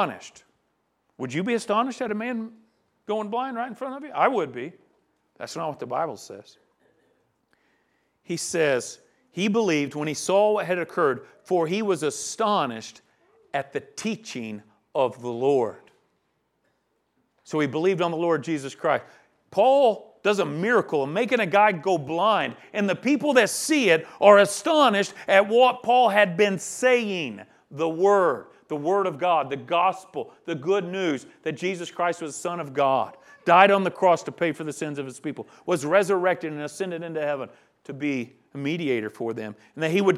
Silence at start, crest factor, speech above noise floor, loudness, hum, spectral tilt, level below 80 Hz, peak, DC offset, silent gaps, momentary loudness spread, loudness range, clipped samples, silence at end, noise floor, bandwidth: 0 s; 24 dB; 49 dB; -24 LUFS; none; -4.5 dB/octave; -78 dBFS; 0 dBFS; under 0.1%; none; 15 LU; 10 LU; under 0.1%; 0 s; -72 dBFS; 14 kHz